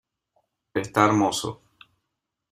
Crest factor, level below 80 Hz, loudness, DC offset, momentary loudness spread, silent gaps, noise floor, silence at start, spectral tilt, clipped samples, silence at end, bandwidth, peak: 24 dB; -62 dBFS; -23 LUFS; under 0.1%; 12 LU; none; -82 dBFS; 0.75 s; -4.5 dB/octave; under 0.1%; 1 s; 15.5 kHz; -2 dBFS